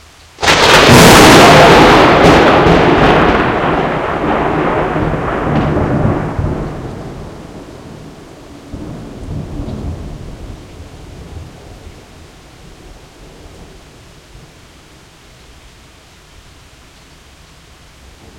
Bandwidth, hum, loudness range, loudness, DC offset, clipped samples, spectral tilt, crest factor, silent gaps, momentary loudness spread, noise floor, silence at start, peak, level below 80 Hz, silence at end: over 20 kHz; none; 23 LU; -8 LUFS; under 0.1%; 1%; -4.5 dB/octave; 12 dB; none; 28 LU; -41 dBFS; 0.4 s; 0 dBFS; -28 dBFS; 4.75 s